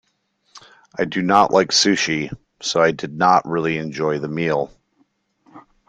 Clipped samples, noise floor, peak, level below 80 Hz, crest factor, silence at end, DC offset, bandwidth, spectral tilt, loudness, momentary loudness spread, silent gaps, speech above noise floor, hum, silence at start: under 0.1%; -66 dBFS; -2 dBFS; -58 dBFS; 20 dB; 0.3 s; under 0.1%; 10.5 kHz; -3.5 dB/octave; -18 LUFS; 11 LU; none; 48 dB; none; 0.55 s